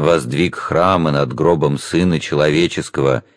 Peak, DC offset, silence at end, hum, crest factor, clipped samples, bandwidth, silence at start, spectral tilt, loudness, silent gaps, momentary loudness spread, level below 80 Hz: 0 dBFS; under 0.1%; 0.15 s; none; 16 dB; under 0.1%; 11 kHz; 0 s; -6 dB/octave; -16 LUFS; none; 4 LU; -44 dBFS